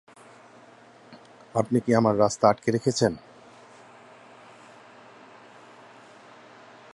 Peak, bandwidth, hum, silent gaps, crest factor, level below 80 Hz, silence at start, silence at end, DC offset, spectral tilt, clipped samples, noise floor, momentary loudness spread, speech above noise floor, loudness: -4 dBFS; 11.5 kHz; none; none; 24 dB; -62 dBFS; 1.1 s; 3.75 s; under 0.1%; -5.5 dB/octave; under 0.1%; -52 dBFS; 8 LU; 29 dB; -23 LUFS